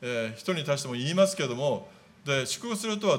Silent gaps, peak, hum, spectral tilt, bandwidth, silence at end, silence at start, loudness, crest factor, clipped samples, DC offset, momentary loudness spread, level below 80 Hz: none; -12 dBFS; none; -4 dB/octave; 16.5 kHz; 0 s; 0 s; -29 LUFS; 18 dB; under 0.1%; under 0.1%; 7 LU; -74 dBFS